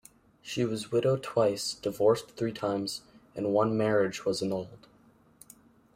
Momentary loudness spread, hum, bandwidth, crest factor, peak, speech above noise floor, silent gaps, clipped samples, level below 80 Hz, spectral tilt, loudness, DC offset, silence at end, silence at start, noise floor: 11 LU; none; 16 kHz; 18 dB; -12 dBFS; 33 dB; none; under 0.1%; -66 dBFS; -5.5 dB/octave; -29 LUFS; under 0.1%; 1.2 s; 0.45 s; -61 dBFS